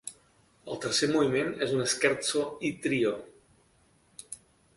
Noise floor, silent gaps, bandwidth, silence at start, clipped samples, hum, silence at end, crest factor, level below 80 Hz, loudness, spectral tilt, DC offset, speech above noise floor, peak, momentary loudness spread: -65 dBFS; none; 11.5 kHz; 0.05 s; under 0.1%; none; 0.4 s; 22 dB; -66 dBFS; -28 LUFS; -3.5 dB/octave; under 0.1%; 37 dB; -10 dBFS; 19 LU